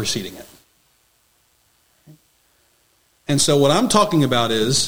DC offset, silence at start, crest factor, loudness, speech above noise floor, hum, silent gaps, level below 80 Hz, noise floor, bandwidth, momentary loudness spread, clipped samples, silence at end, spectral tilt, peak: under 0.1%; 0 s; 20 dB; -17 LUFS; 44 dB; none; none; -50 dBFS; -61 dBFS; 18 kHz; 19 LU; under 0.1%; 0 s; -4 dB/octave; 0 dBFS